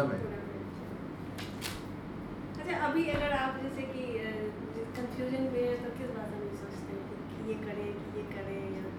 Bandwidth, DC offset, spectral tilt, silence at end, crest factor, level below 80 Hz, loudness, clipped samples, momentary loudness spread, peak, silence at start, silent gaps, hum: over 20 kHz; under 0.1%; -6 dB/octave; 0 s; 18 dB; -54 dBFS; -37 LUFS; under 0.1%; 11 LU; -18 dBFS; 0 s; none; none